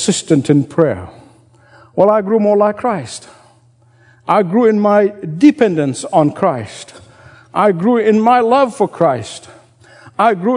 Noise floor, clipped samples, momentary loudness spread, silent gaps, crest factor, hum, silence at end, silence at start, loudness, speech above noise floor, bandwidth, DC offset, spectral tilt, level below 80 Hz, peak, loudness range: -50 dBFS; 0.1%; 15 LU; none; 14 dB; none; 0 s; 0 s; -13 LUFS; 37 dB; 11 kHz; under 0.1%; -6 dB/octave; -60 dBFS; 0 dBFS; 2 LU